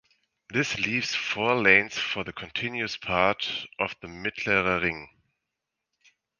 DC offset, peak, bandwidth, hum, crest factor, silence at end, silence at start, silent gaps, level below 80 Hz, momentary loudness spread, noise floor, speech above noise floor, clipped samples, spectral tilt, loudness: under 0.1%; -2 dBFS; 10 kHz; none; 26 dB; 1.35 s; 0.5 s; none; -56 dBFS; 12 LU; -85 dBFS; 58 dB; under 0.1%; -4 dB/octave; -25 LUFS